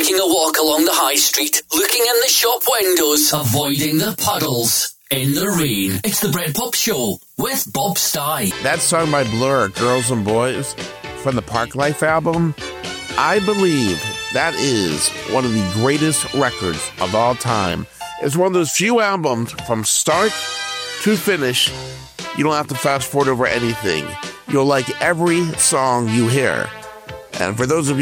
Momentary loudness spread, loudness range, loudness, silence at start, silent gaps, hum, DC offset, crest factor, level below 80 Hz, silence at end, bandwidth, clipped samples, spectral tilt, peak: 9 LU; 4 LU; -17 LUFS; 0 s; none; none; under 0.1%; 16 dB; -50 dBFS; 0 s; 19 kHz; under 0.1%; -3.5 dB/octave; -2 dBFS